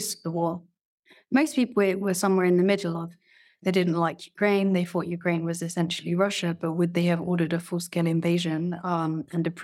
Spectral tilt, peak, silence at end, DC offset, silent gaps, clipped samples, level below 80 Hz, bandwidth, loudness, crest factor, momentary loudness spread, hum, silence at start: -6 dB/octave; -8 dBFS; 0 s; under 0.1%; 0.81-1.03 s; under 0.1%; -74 dBFS; 14.5 kHz; -26 LUFS; 18 dB; 7 LU; none; 0 s